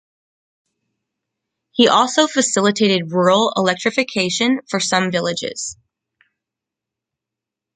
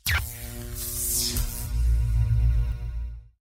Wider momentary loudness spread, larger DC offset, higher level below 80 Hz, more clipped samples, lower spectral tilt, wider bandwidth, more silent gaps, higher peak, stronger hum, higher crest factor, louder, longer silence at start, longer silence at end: second, 9 LU vs 12 LU; neither; second, -64 dBFS vs -28 dBFS; neither; about the same, -3.5 dB/octave vs -3 dB/octave; second, 9.6 kHz vs 16 kHz; neither; first, 0 dBFS vs -12 dBFS; neither; about the same, 18 dB vs 14 dB; first, -17 LUFS vs -27 LUFS; first, 1.75 s vs 0.05 s; first, 2 s vs 0.15 s